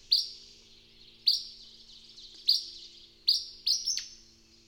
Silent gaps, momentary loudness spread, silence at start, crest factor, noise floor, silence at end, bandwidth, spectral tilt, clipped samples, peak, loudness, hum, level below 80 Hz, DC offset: none; 22 LU; 0.1 s; 22 dB; -58 dBFS; 0.55 s; 17 kHz; 2.5 dB/octave; under 0.1%; -12 dBFS; -28 LUFS; none; -66 dBFS; under 0.1%